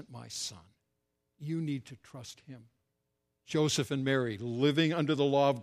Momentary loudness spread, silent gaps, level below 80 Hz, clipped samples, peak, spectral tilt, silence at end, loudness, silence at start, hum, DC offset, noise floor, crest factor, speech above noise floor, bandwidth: 20 LU; none; -74 dBFS; under 0.1%; -16 dBFS; -5 dB/octave; 0 s; -31 LUFS; 0 s; none; under 0.1%; -82 dBFS; 18 dB; 51 dB; 14.5 kHz